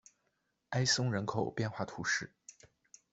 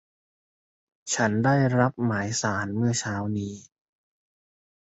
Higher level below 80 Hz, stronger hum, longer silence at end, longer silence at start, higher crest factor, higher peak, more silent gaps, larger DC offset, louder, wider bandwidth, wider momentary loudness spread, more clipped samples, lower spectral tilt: second, -70 dBFS vs -58 dBFS; neither; second, 0.6 s vs 1.25 s; second, 0.7 s vs 1.05 s; about the same, 20 dB vs 20 dB; second, -16 dBFS vs -8 dBFS; neither; neither; second, -34 LUFS vs -25 LUFS; about the same, 8.2 kHz vs 8.2 kHz; second, 8 LU vs 11 LU; neither; second, -3.5 dB/octave vs -5 dB/octave